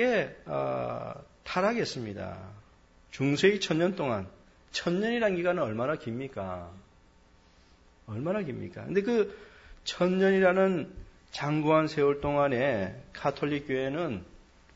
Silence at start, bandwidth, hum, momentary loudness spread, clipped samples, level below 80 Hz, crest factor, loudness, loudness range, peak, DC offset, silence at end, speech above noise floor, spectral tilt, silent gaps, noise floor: 0 s; 8 kHz; none; 16 LU; under 0.1%; -58 dBFS; 20 dB; -29 LUFS; 7 LU; -10 dBFS; under 0.1%; 0.4 s; 31 dB; -6 dB/octave; none; -60 dBFS